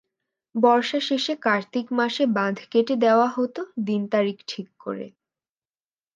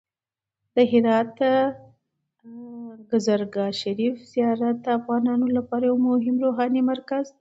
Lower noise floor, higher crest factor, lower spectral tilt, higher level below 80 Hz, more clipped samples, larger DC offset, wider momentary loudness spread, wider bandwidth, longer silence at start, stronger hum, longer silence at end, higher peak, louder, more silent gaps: about the same, under -90 dBFS vs under -90 dBFS; about the same, 18 dB vs 18 dB; about the same, -5.5 dB/octave vs -6 dB/octave; second, -78 dBFS vs -68 dBFS; neither; neither; first, 15 LU vs 9 LU; about the same, 7.6 kHz vs 7.8 kHz; second, 0.55 s vs 0.75 s; neither; first, 1.05 s vs 0.1 s; about the same, -4 dBFS vs -6 dBFS; about the same, -23 LUFS vs -23 LUFS; neither